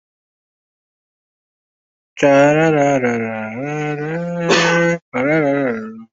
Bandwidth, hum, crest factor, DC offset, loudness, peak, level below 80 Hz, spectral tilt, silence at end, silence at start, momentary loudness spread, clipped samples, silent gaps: 8 kHz; none; 16 dB; under 0.1%; -16 LUFS; -2 dBFS; -60 dBFS; -5.5 dB/octave; 0.1 s; 2.15 s; 11 LU; under 0.1%; 5.02-5.12 s